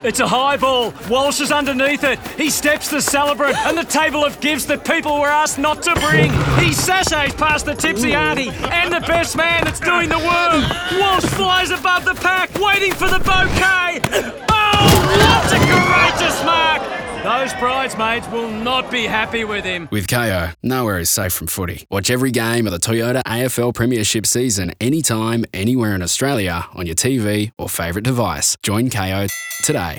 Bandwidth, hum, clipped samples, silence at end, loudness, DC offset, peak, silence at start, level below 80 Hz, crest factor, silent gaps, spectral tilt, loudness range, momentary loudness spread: over 20 kHz; none; under 0.1%; 0 s; -16 LUFS; under 0.1%; -2 dBFS; 0 s; -36 dBFS; 16 dB; none; -3.5 dB/octave; 5 LU; 7 LU